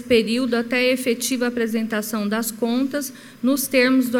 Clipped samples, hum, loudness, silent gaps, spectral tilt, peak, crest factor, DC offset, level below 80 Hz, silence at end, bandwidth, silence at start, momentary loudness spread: under 0.1%; none; -21 LUFS; none; -3.5 dB/octave; -6 dBFS; 16 dB; under 0.1%; -60 dBFS; 0 s; 18 kHz; 0 s; 7 LU